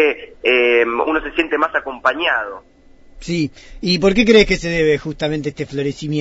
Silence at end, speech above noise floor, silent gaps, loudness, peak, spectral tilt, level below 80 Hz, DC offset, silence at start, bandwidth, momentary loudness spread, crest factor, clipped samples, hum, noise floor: 0 s; 24 dB; none; -17 LUFS; 0 dBFS; -5 dB/octave; -38 dBFS; under 0.1%; 0 s; 8 kHz; 12 LU; 16 dB; under 0.1%; none; -41 dBFS